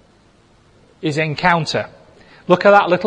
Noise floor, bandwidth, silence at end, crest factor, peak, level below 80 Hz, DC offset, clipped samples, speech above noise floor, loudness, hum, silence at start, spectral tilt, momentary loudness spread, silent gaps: -52 dBFS; 10 kHz; 0 s; 18 dB; 0 dBFS; -54 dBFS; under 0.1%; under 0.1%; 37 dB; -16 LUFS; none; 1 s; -5.5 dB/octave; 17 LU; none